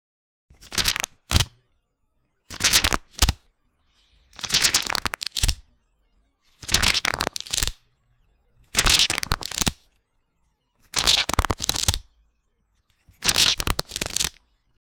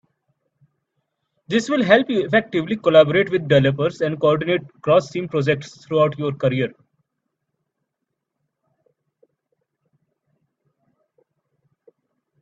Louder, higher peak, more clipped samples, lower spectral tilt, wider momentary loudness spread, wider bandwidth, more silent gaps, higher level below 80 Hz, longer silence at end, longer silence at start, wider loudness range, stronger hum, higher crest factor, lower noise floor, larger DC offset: about the same, -21 LUFS vs -19 LUFS; about the same, 0 dBFS vs 0 dBFS; neither; second, -1 dB/octave vs -6.5 dB/octave; about the same, 10 LU vs 9 LU; first, over 20 kHz vs 8 kHz; neither; first, -36 dBFS vs -62 dBFS; second, 0.7 s vs 5.7 s; second, 0.65 s vs 1.5 s; second, 3 LU vs 9 LU; neither; about the same, 26 dB vs 22 dB; second, -70 dBFS vs -79 dBFS; neither